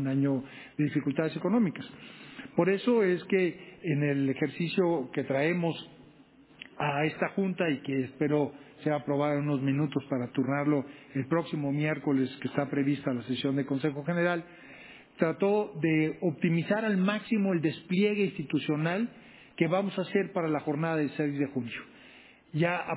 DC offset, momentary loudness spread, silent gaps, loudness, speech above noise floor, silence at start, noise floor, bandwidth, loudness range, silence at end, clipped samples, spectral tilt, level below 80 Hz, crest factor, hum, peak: under 0.1%; 10 LU; none; -30 LUFS; 28 dB; 0 s; -57 dBFS; 4 kHz; 3 LU; 0 s; under 0.1%; -6 dB/octave; -72 dBFS; 20 dB; none; -10 dBFS